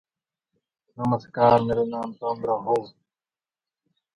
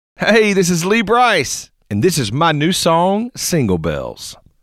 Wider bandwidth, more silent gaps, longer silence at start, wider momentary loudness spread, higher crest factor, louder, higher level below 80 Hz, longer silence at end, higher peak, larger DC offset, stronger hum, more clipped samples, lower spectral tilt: second, 10.5 kHz vs 16 kHz; neither; first, 1 s vs 0.2 s; about the same, 11 LU vs 12 LU; first, 22 dB vs 14 dB; second, -24 LUFS vs -15 LUFS; second, -58 dBFS vs -44 dBFS; first, 1.25 s vs 0.3 s; about the same, -4 dBFS vs -2 dBFS; neither; neither; neither; first, -8.5 dB/octave vs -4.5 dB/octave